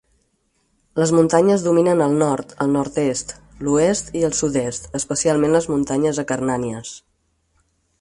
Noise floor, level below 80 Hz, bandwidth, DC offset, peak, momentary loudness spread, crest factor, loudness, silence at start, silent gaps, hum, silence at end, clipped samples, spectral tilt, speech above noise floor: -66 dBFS; -50 dBFS; 11.5 kHz; under 0.1%; -2 dBFS; 12 LU; 18 dB; -19 LUFS; 0.95 s; none; none; 1.05 s; under 0.1%; -5.5 dB/octave; 48 dB